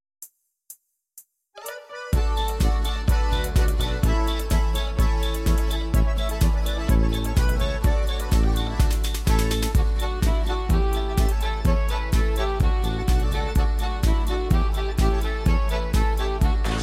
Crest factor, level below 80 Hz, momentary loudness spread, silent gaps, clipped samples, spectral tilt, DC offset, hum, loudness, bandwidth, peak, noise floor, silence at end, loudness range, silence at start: 14 dB; -22 dBFS; 2 LU; none; under 0.1%; -5.5 dB/octave; under 0.1%; none; -24 LUFS; 15.5 kHz; -6 dBFS; -52 dBFS; 0 s; 1 LU; 0.2 s